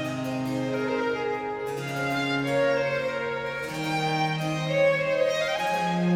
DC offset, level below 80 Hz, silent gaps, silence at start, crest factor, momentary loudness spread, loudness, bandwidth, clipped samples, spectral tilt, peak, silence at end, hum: under 0.1%; -60 dBFS; none; 0 s; 14 dB; 7 LU; -26 LUFS; 16.5 kHz; under 0.1%; -5.5 dB/octave; -12 dBFS; 0 s; none